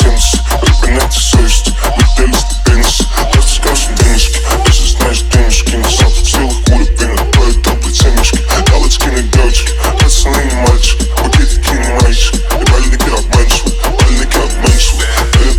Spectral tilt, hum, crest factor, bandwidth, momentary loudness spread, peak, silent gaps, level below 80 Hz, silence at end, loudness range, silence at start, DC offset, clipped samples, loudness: -4 dB/octave; none; 8 dB; 18 kHz; 3 LU; 0 dBFS; none; -10 dBFS; 0 s; 1 LU; 0 s; under 0.1%; 0.4%; -10 LUFS